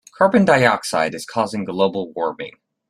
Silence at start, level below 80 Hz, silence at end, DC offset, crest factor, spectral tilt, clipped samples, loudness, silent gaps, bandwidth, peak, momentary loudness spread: 0.2 s; -60 dBFS; 0.4 s; under 0.1%; 18 dB; -5 dB/octave; under 0.1%; -18 LUFS; none; 14 kHz; -2 dBFS; 12 LU